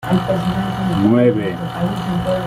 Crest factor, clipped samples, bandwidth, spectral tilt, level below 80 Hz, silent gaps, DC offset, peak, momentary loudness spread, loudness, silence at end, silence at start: 14 dB; under 0.1%; 15.5 kHz; -7.5 dB/octave; -40 dBFS; none; under 0.1%; -2 dBFS; 8 LU; -18 LUFS; 0 s; 0 s